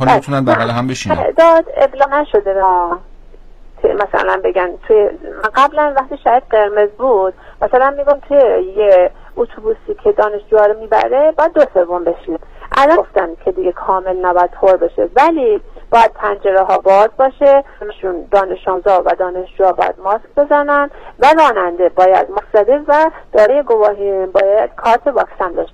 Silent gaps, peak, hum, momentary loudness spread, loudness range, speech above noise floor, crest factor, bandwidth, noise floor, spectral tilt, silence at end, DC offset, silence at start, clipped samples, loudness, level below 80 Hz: none; 0 dBFS; none; 8 LU; 3 LU; 23 dB; 12 dB; 9.2 kHz; -36 dBFS; -6 dB/octave; 0.05 s; under 0.1%; 0 s; under 0.1%; -13 LUFS; -38 dBFS